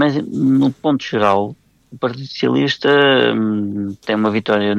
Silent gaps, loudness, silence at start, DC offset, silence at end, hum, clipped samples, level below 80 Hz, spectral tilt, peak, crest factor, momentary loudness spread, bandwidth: none; -16 LUFS; 0 s; under 0.1%; 0 s; none; under 0.1%; -60 dBFS; -6.5 dB/octave; -2 dBFS; 14 dB; 11 LU; 7.6 kHz